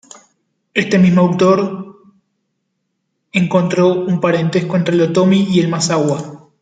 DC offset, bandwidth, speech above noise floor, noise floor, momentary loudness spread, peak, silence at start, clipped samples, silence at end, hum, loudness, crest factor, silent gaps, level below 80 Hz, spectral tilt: under 0.1%; 9.2 kHz; 58 dB; -71 dBFS; 9 LU; 0 dBFS; 0.75 s; under 0.1%; 0.25 s; none; -14 LUFS; 14 dB; none; -56 dBFS; -6 dB/octave